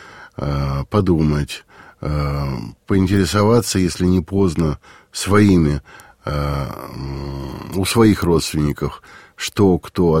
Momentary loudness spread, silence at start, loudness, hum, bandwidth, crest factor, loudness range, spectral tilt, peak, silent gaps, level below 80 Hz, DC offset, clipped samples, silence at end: 15 LU; 0 s; -18 LUFS; none; 16.5 kHz; 16 dB; 3 LU; -6 dB/octave; -2 dBFS; none; -32 dBFS; under 0.1%; under 0.1%; 0 s